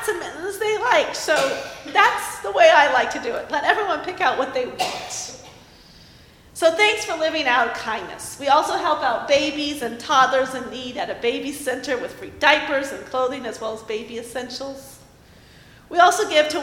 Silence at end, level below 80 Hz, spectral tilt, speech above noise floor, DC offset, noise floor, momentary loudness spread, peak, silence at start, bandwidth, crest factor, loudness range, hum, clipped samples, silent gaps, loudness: 0 s; -56 dBFS; -2 dB/octave; 28 dB; under 0.1%; -49 dBFS; 14 LU; 0 dBFS; 0 s; 16.5 kHz; 22 dB; 6 LU; none; under 0.1%; none; -20 LUFS